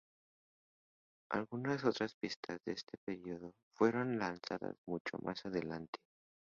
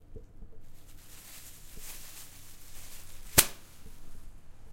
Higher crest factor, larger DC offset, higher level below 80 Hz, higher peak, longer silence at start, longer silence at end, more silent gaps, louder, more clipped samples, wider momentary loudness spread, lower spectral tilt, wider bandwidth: second, 24 dB vs 32 dB; neither; second, -74 dBFS vs -48 dBFS; second, -18 dBFS vs -4 dBFS; first, 1.3 s vs 0 s; first, 0.6 s vs 0 s; first, 2.14-2.21 s, 2.36-2.43 s, 2.98-3.07 s, 3.63-3.71 s, 4.78-4.85 s, 5.00-5.05 s, 5.88-5.93 s vs none; second, -40 LUFS vs -26 LUFS; neither; second, 12 LU vs 30 LU; first, -4.5 dB/octave vs -1.5 dB/octave; second, 7.4 kHz vs 16.5 kHz